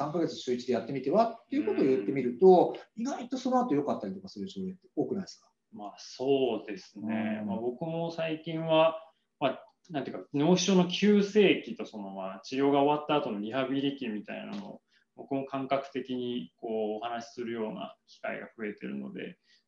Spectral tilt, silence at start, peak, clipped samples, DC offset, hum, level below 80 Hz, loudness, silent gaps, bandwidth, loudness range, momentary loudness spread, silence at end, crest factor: -6 dB/octave; 0 s; -8 dBFS; under 0.1%; under 0.1%; none; -78 dBFS; -30 LUFS; none; 7.4 kHz; 8 LU; 16 LU; 0.35 s; 22 dB